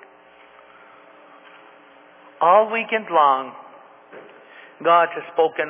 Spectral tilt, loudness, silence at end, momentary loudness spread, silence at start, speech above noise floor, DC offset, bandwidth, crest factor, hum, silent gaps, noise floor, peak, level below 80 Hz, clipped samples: -7.5 dB/octave; -19 LUFS; 0 s; 9 LU; 2.4 s; 31 dB; under 0.1%; 3.7 kHz; 20 dB; none; none; -49 dBFS; -2 dBFS; -84 dBFS; under 0.1%